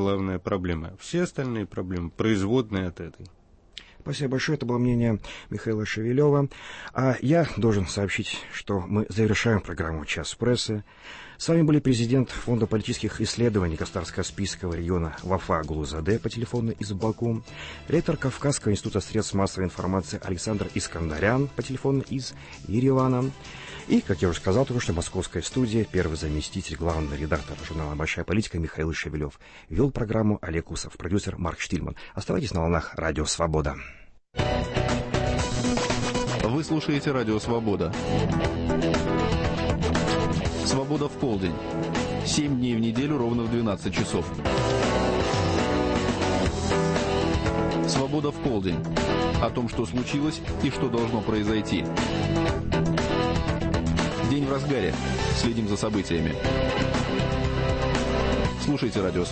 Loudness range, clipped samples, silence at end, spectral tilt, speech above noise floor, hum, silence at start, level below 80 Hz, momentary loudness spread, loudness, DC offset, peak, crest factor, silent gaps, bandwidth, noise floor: 3 LU; under 0.1%; 0 s; -5.5 dB/octave; 22 dB; none; 0 s; -38 dBFS; 7 LU; -26 LUFS; under 0.1%; -10 dBFS; 16 dB; none; 8.8 kHz; -48 dBFS